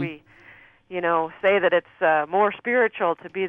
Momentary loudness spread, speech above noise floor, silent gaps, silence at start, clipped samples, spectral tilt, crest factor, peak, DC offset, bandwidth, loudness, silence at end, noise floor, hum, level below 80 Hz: 7 LU; 29 dB; none; 0 s; under 0.1%; -8 dB/octave; 16 dB; -8 dBFS; under 0.1%; 3.9 kHz; -22 LUFS; 0 s; -51 dBFS; none; -68 dBFS